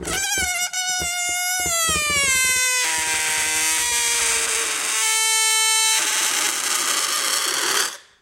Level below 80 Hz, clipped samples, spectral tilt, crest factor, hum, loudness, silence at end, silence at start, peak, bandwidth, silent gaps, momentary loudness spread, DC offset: -48 dBFS; under 0.1%; 1 dB/octave; 18 dB; none; -18 LUFS; 0.2 s; 0 s; -4 dBFS; 17 kHz; none; 5 LU; under 0.1%